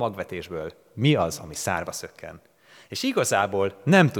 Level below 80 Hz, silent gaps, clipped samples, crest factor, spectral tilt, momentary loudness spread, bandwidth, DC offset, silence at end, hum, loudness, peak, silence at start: -60 dBFS; none; under 0.1%; 22 dB; -5 dB/octave; 16 LU; 18.5 kHz; under 0.1%; 0 s; none; -25 LUFS; -4 dBFS; 0 s